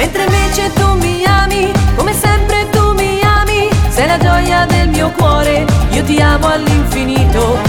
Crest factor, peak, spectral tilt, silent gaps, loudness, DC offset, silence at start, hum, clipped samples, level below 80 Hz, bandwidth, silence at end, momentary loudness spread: 10 dB; 0 dBFS; -5 dB/octave; none; -11 LUFS; under 0.1%; 0 s; none; under 0.1%; -16 dBFS; 18 kHz; 0 s; 2 LU